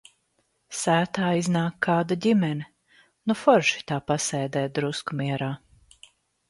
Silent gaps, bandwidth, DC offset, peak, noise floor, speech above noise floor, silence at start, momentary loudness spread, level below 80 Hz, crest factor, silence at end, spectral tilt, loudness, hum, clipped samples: none; 11.5 kHz; under 0.1%; -4 dBFS; -71 dBFS; 47 dB; 0.7 s; 12 LU; -64 dBFS; 22 dB; 0.9 s; -5 dB/octave; -25 LUFS; none; under 0.1%